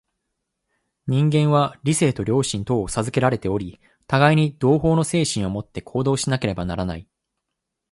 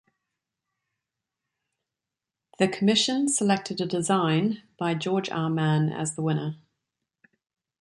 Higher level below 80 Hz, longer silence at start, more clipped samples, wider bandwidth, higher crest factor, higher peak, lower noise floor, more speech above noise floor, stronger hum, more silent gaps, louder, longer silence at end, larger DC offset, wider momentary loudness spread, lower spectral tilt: first, -46 dBFS vs -70 dBFS; second, 1.05 s vs 2.6 s; neither; about the same, 11.5 kHz vs 11.5 kHz; about the same, 18 dB vs 20 dB; first, -2 dBFS vs -8 dBFS; second, -81 dBFS vs -88 dBFS; about the same, 61 dB vs 63 dB; neither; neither; first, -21 LUFS vs -25 LUFS; second, 0.9 s vs 1.25 s; neither; first, 11 LU vs 8 LU; about the same, -5.5 dB/octave vs -4.5 dB/octave